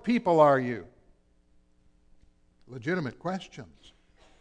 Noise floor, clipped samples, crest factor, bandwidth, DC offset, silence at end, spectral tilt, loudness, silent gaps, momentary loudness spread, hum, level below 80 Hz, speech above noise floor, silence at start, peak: -63 dBFS; under 0.1%; 22 dB; 9.4 kHz; under 0.1%; 0.75 s; -7 dB/octave; -27 LUFS; none; 24 LU; none; -64 dBFS; 36 dB; 0.05 s; -8 dBFS